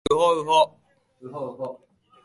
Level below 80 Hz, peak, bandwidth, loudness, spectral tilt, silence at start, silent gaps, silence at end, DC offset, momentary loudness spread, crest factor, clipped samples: -56 dBFS; -6 dBFS; 11.5 kHz; -22 LUFS; -4 dB/octave; 0.1 s; none; 0.5 s; under 0.1%; 16 LU; 18 dB; under 0.1%